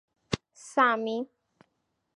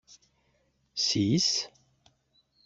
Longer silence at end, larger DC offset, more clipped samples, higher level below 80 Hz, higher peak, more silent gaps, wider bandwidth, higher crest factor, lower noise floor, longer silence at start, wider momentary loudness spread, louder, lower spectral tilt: about the same, 0.9 s vs 1 s; neither; neither; about the same, -62 dBFS vs -66 dBFS; first, -10 dBFS vs -14 dBFS; neither; first, 11.5 kHz vs 8.2 kHz; about the same, 22 dB vs 18 dB; first, -78 dBFS vs -71 dBFS; second, 0.3 s vs 0.95 s; second, 11 LU vs 15 LU; about the same, -28 LUFS vs -27 LUFS; about the same, -4.5 dB/octave vs -3.5 dB/octave